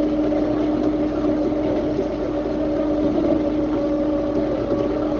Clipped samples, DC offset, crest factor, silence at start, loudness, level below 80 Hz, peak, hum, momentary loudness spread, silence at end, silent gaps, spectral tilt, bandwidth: under 0.1%; under 0.1%; 14 dB; 0 s; -21 LUFS; -38 dBFS; -8 dBFS; none; 3 LU; 0 s; none; -8.5 dB/octave; 6.8 kHz